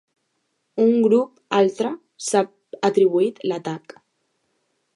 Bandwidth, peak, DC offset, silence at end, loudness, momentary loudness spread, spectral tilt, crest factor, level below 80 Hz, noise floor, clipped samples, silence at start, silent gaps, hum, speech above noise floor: 11.5 kHz; -4 dBFS; under 0.1%; 1.15 s; -21 LUFS; 12 LU; -5 dB/octave; 18 dB; -78 dBFS; -72 dBFS; under 0.1%; 0.75 s; none; none; 53 dB